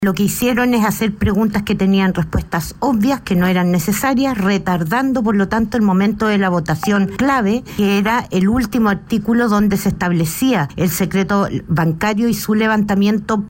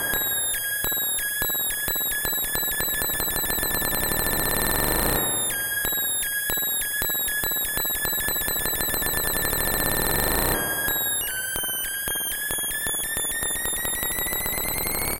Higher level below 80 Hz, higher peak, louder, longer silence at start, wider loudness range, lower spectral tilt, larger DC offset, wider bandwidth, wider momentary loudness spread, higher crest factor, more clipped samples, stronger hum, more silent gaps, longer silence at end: about the same, -36 dBFS vs -38 dBFS; second, -6 dBFS vs -2 dBFS; first, -16 LUFS vs -23 LUFS; about the same, 0 s vs 0 s; about the same, 1 LU vs 2 LU; first, -6 dB/octave vs -1.5 dB/octave; neither; about the same, 16.5 kHz vs 17.5 kHz; about the same, 3 LU vs 3 LU; second, 10 dB vs 24 dB; neither; neither; neither; about the same, 0 s vs 0 s